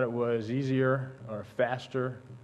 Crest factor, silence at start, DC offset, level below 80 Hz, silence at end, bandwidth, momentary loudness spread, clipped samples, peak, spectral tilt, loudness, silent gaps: 16 dB; 0 s; under 0.1%; -72 dBFS; 0 s; 8.6 kHz; 11 LU; under 0.1%; -14 dBFS; -8 dB/octave; -31 LUFS; none